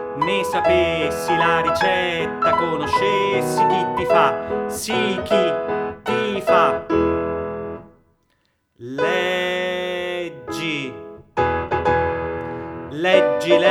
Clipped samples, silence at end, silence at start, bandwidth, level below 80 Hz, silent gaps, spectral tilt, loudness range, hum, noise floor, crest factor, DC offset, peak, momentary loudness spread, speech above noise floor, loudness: under 0.1%; 0 s; 0 s; 17.5 kHz; -46 dBFS; none; -4.5 dB/octave; 6 LU; none; -66 dBFS; 18 dB; under 0.1%; -2 dBFS; 12 LU; 48 dB; -20 LUFS